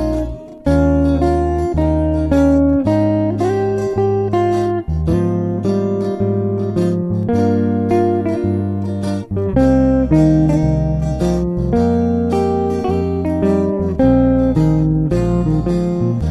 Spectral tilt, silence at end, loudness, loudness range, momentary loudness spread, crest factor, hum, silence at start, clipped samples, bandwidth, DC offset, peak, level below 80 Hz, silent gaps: -9 dB/octave; 0 s; -16 LUFS; 2 LU; 6 LU; 14 dB; none; 0 s; under 0.1%; 11.5 kHz; under 0.1%; -2 dBFS; -26 dBFS; none